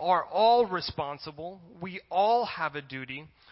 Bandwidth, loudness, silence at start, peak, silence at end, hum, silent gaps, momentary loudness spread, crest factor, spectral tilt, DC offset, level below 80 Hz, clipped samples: 5.8 kHz; -27 LUFS; 0 s; -12 dBFS; 0.25 s; none; none; 18 LU; 16 dB; -8.5 dB/octave; under 0.1%; -62 dBFS; under 0.1%